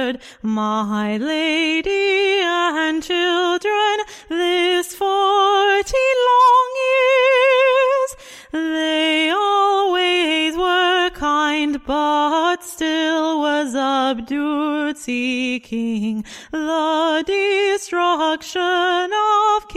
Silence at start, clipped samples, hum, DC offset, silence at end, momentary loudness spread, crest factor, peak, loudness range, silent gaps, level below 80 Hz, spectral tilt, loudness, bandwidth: 0 s; under 0.1%; none; under 0.1%; 0 s; 9 LU; 12 dB; -4 dBFS; 5 LU; none; -50 dBFS; -3 dB/octave; -17 LUFS; 15.5 kHz